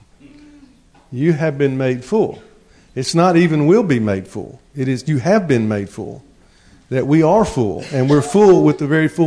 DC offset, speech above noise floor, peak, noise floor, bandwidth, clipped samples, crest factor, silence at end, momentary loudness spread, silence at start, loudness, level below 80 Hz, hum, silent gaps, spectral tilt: under 0.1%; 33 dB; -2 dBFS; -48 dBFS; 11 kHz; under 0.1%; 14 dB; 0 s; 16 LU; 1.1 s; -15 LUFS; -48 dBFS; none; none; -7 dB/octave